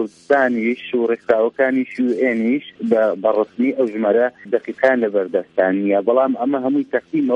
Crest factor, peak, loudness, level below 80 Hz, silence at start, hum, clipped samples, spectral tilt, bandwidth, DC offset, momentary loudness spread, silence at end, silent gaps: 16 dB; -2 dBFS; -18 LUFS; -68 dBFS; 0 s; none; under 0.1%; -7.5 dB/octave; 8 kHz; under 0.1%; 4 LU; 0 s; none